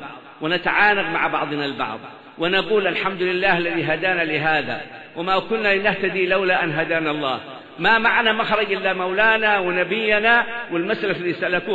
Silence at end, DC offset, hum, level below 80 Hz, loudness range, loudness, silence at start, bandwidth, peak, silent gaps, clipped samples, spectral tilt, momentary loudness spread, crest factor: 0 s; under 0.1%; none; -52 dBFS; 3 LU; -19 LUFS; 0 s; 8 kHz; -4 dBFS; none; under 0.1%; -6.5 dB/octave; 11 LU; 16 dB